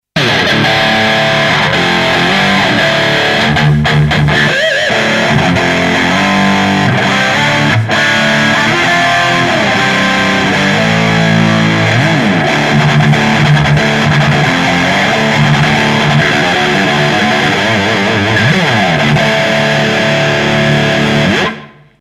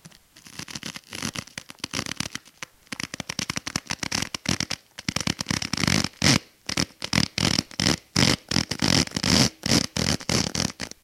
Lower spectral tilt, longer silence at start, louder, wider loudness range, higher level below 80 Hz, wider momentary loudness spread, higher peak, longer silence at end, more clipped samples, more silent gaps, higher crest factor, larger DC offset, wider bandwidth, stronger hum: first, -5 dB/octave vs -3 dB/octave; about the same, 0.15 s vs 0.05 s; first, -9 LUFS vs -24 LUFS; second, 1 LU vs 10 LU; first, -34 dBFS vs -46 dBFS; second, 1 LU vs 14 LU; about the same, 0 dBFS vs -2 dBFS; first, 0.35 s vs 0.15 s; neither; neither; second, 10 dB vs 26 dB; neither; second, 13.5 kHz vs 17 kHz; neither